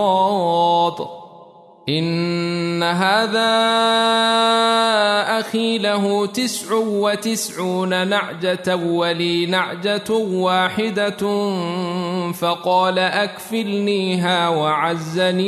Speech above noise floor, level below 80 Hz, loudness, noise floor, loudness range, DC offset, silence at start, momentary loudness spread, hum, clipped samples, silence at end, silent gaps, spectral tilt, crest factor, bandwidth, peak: 26 dB; -66 dBFS; -18 LUFS; -44 dBFS; 4 LU; under 0.1%; 0 s; 7 LU; none; under 0.1%; 0 s; none; -4.5 dB/octave; 14 dB; 13.5 kHz; -4 dBFS